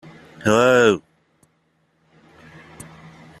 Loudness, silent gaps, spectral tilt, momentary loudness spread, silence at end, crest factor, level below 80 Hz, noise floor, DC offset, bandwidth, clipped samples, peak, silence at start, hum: -17 LUFS; none; -5 dB/octave; 27 LU; 2.4 s; 20 dB; -58 dBFS; -65 dBFS; under 0.1%; 13.5 kHz; under 0.1%; -2 dBFS; 0.45 s; none